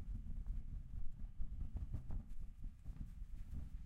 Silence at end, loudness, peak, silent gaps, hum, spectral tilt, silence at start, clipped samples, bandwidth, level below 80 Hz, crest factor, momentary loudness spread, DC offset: 0 s; -52 LUFS; -30 dBFS; none; none; -8.5 dB/octave; 0 s; under 0.1%; 3 kHz; -46 dBFS; 14 dB; 6 LU; under 0.1%